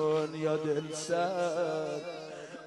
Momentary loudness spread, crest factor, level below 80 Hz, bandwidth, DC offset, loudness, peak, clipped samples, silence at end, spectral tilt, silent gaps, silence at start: 11 LU; 14 dB; -80 dBFS; 11.5 kHz; under 0.1%; -33 LUFS; -18 dBFS; under 0.1%; 0 s; -5 dB/octave; none; 0 s